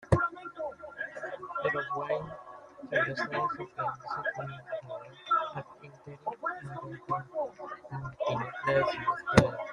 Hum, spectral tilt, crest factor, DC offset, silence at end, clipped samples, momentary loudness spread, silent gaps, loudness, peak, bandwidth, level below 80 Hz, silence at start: none; -6 dB/octave; 30 dB; under 0.1%; 0 s; under 0.1%; 15 LU; none; -33 LUFS; -2 dBFS; 12 kHz; -54 dBFS; 0 s